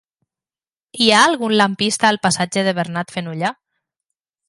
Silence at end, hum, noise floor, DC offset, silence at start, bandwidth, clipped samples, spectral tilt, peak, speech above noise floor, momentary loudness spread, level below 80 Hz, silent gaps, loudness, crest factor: 0.95 s; none; under -90 dBFS; under 0.1%; 0.95 s; 11.5 kHz; under 0.1%; -3.5 dB/octave; 0 dBFS; over 73 dB; 12 LU; -62 dBFS; none; -17 LUFS; 18 dB